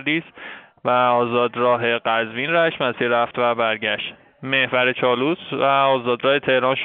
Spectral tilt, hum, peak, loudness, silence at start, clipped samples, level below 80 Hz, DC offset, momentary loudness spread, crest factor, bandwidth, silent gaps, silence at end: -2 dB/octave; none; -4 dBFS; -19 LUFS; 0 s; under 0.1%; -66 dBFS; under 0.1%; 8 LU; 16 dB; 4.4 kHz; none; 0 s